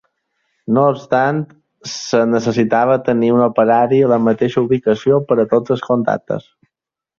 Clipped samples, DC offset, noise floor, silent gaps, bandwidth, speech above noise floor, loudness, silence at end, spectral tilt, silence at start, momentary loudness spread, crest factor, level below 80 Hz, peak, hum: under 0.1%; under 0.1%; -82 dBFS; none; 7.4 kHz; 68 dB; -15 LUFS; 0.8 s; -6.5 dB/octave; 0.7 s; 12 LU; 14 dB; -58 dBFS; -2 dBFS; none